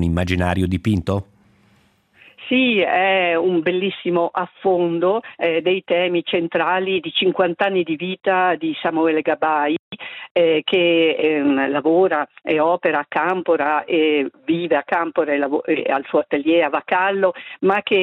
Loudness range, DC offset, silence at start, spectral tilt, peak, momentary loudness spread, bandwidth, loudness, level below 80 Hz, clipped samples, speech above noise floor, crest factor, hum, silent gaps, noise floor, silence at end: 2 LU; under 0.1%; 0 s; -7 dB/octave; -4 dBFS; 5 LU; 10.5 kHz; -19 LUFS; -52 dBFS; under 0.1%; 39 dB; 14 dB; none; 9.79-9.91 s, 10.31-10.35 s; -58 dBFS; 0 s